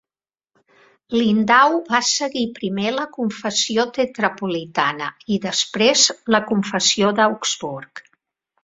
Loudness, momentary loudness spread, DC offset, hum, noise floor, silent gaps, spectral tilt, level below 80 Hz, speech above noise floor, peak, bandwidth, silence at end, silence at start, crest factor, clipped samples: -19 LUFS; 10 LU; under 0.1%; none; under -90 dBFS; none; -2.5 dB/octave; -62 dBFS; over 71 dB; -2 dBFS; 8 kHz; 0.65 s; 1.1 s; 20 dB; under 0.1%